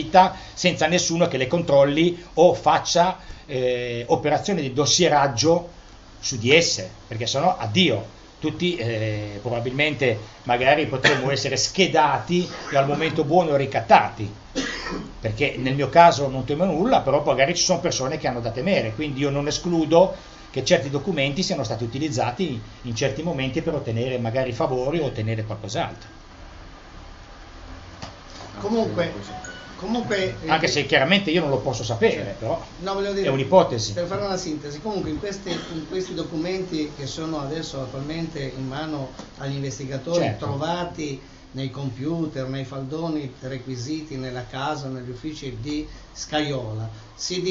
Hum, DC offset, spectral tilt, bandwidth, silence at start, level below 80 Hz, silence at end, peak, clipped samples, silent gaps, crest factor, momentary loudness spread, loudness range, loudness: none; under 0.1%; -4.5 dB/octave; 8 kHz; 0 s; -46 dBFS; 0 s; 0 dBFS; under 0.1%; none; 22 dB; 14 LU; 10 LU; -23 LUFS